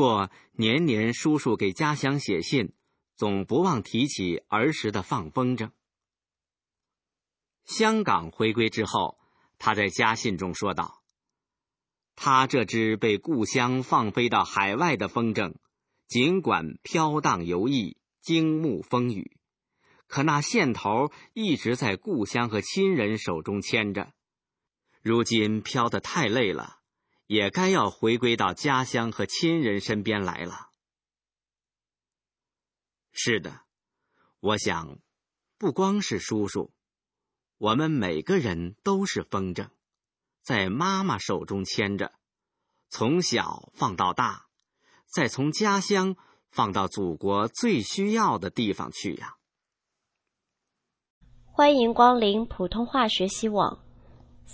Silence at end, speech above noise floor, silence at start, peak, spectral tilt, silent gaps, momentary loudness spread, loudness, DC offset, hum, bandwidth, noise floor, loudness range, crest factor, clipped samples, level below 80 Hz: 0 s; over 65 dB; 0 s; -4 dBFS; -5 dB/octave; 51.10-51.21 s; 10 LU; -26 LUFS; under 0.1%; none; 8 kHz; under -90 dBFS; 6 LU; 22 dB; under 0.1%; -56 dBFS